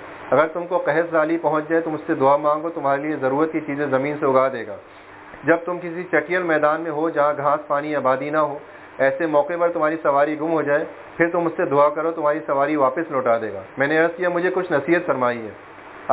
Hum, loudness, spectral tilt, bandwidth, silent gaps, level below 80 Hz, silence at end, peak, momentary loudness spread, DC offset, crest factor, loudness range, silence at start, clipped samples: none; -21 LUFS; -10 dB/octave; 4 kHz; none; -64 dBFS; 0 s; -2 dBFS; 8 LU; under 0.1%; 18 dB; 2 LU; 0 s; under 0.1%